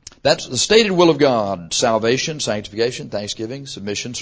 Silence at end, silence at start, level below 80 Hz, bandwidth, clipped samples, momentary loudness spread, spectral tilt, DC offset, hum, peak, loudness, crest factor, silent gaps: 0 s; 0.25 s; -50 dBFS; 8 kHz; under 0.1%; 12 LU; -3.5 dB/octave; under 0.1%; none; 0 dBFS; -18 LUFS; 18 dB; none